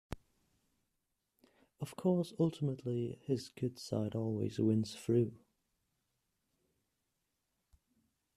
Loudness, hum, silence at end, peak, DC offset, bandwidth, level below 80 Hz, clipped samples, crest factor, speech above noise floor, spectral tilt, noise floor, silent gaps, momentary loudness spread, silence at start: -36 LUFS; none; 3 s; -20 dBFS; under 0.1%; 14 kHz; -66 dBFS; under 0.1%; 20 dB; 50 dB; -7.5 dB/octave; -85 dBFS; none; 9 LU; 0.1 s